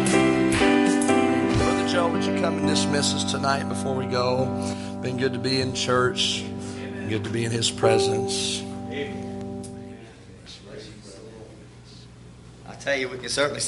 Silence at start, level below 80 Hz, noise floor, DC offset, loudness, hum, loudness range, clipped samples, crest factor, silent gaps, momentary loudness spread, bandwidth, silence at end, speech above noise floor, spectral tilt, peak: 0 s; -48 dBFS; -45 dBFS; under 0.1%; -23 LUFS; none; 15 LU; under 0.1%; 20 dB; none; 21 LU; 11.5 kHz; 0 s; 21 dB; -4.5 dB/octave; -4 dBFS